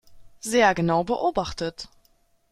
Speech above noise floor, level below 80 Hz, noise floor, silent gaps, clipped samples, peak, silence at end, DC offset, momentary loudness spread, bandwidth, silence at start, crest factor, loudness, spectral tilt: 40 dB; -50 dBFS; -63 dBFS; none; under 0.1%; -4 dBFS; 0.65 s; under 0.1%; 18 LU; 14.5 kHz; 0.1 s; 20 dB; -23 LUFS; -4.5 dB/octave